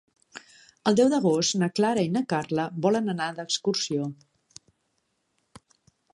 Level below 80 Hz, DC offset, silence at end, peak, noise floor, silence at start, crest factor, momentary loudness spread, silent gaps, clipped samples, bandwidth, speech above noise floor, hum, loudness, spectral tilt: -70 dBFS; under 0.1%; 2 s; -8 dBFS; -75 dBFS; 0.35 s; 20 dB; 15 LU; none; under 0.1%; 11.5 kHz; 50 dB; none; -25 LUFS; -4.5 dB/octave